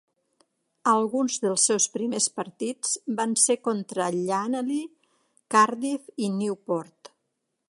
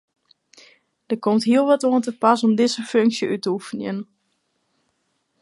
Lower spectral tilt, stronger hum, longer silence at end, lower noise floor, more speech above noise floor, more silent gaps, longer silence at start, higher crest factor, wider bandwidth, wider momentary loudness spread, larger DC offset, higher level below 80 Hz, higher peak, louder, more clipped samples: second, -3 dB/octave vs -5 dB/octave; neither; second, 0.65 s vs 1.4 s; first, -79 dBFS vs -71 dBFS; about the same, 54 dB vs 51 dB; neither; second, 0.85 s vs 1.1 s; about the same, 22 dB vs 18 dB; about the same, 11.5 kHz vs 11.5 kHz; about the same, 10 LU vs 12 LU; neither; second, -80 dBFS vs -74 dBFS; about the same, -4 dBFS vs -2 dBFS; second, -25 LUFS vs -20 LUFS; neither